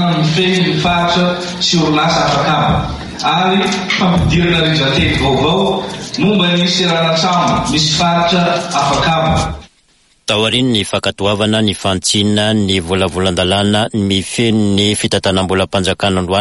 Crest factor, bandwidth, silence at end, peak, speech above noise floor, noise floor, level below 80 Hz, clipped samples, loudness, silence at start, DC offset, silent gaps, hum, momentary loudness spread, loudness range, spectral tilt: 12 dB; 11.5 kHz; 0 s; -2 dBFS; 40 dB; -53 dBFS; -34 dBFS; under 0.1%; -13 LUFS; 0 s; under 0.1%; none; none; 4 LU; 2 LU; -4.5 dB/octave